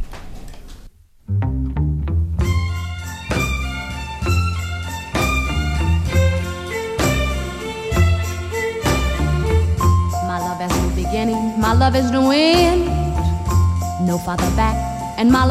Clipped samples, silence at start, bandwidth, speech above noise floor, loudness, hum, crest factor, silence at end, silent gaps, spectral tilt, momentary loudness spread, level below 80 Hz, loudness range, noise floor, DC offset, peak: under 0.1%; 0 s; 15 kHz; 27 dB; -19 LUFS; none; 14 dB; 0 s; none; -6 dB/octave; 10 LU; -26 dBFS; 5 LU; -42 dBFS; under 0.1%; -4 dBFS